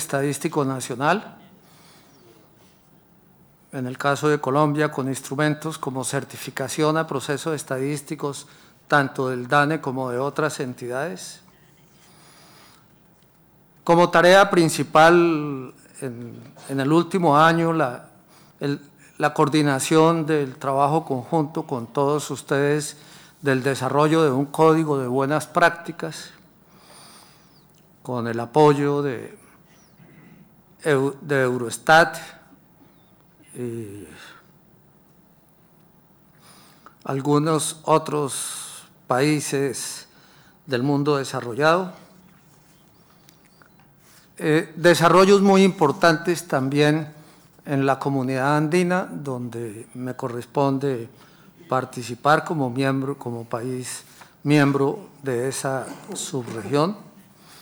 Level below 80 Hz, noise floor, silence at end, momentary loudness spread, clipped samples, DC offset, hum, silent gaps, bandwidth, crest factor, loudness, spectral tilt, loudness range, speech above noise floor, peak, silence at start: -64 dBFS; -56 dBFS; 0.55 s; 17 LU; under 0.1%; under 0.1%; none; none; over 20 kHz; 18 dB; -21 LUFS; -5.5 dB/octave; 10 LU; 35 dB; -6 dBFS; 0 s